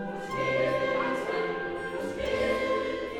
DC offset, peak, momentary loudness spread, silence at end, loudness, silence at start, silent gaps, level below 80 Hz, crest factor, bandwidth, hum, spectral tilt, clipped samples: under 0.1%; -16 dBFS; 7 LU; 0 s; -29 LUFS; 0 s; none; -54 dBFS; 14 dB; 13.5 kHz; none; -5 dB/octave; under 0.1%